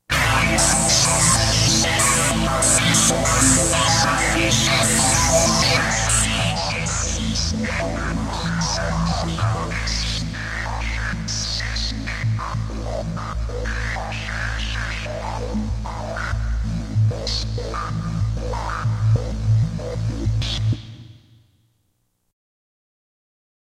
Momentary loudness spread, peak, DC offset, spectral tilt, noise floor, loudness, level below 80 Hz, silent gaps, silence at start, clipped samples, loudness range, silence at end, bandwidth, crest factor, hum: 12 LU; 0 dBFS; under 0.1%; -3 dB/octave; -69 dBFS; -20 LUFS; -30 dBFS; none; 0.1 s; under 0.1%; 11 LU; 2.65 s; 15.5 kHz; 20 dB; none